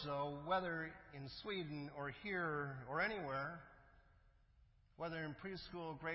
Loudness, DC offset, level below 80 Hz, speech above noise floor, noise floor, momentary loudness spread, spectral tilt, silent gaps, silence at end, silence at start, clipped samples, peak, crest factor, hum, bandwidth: -45 LUFS; under 0.1%; -70 dBFS; 26 dB; -71 dBFS; 10 LU; -3.5 dB/octave; none; 0 s; 0 s; under 0.1%; -26 dBFS; 20 dB; none; 5.6 kHz